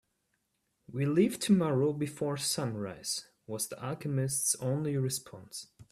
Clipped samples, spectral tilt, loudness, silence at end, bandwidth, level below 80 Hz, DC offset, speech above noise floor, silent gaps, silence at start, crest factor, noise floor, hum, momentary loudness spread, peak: under 0.1%; -5 dB/octave; -31 LUFS; 0.1 s; 15.5 kHz; -68 dBFS; under 0.1%; 48 dB; none; 0.9 s; 18 dB; -79 dBFS; none; 16 LU; -14 dBFS